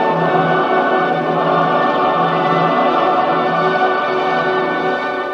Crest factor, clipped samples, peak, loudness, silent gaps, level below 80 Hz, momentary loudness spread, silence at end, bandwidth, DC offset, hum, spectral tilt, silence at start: 12 dB; under 0.1%; -2 dBFS; -15 LUFS; none; -56 dBFS; 3 LU; 0 s; 7.6 kHz; under 0.1%; none; -7 dB/octave; 0 s